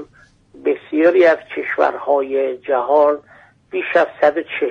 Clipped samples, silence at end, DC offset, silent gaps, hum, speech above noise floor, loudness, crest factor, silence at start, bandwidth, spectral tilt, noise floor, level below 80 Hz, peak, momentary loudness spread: under 0.1%; 0 s; under 0.1%; none; none; 34 dB; -17 LUFS; 14 dB; 0 s; 7 kHz; -5.5 dB/octave; -50 dBFS; -64 dBFS; -2 dBFS; 10 LU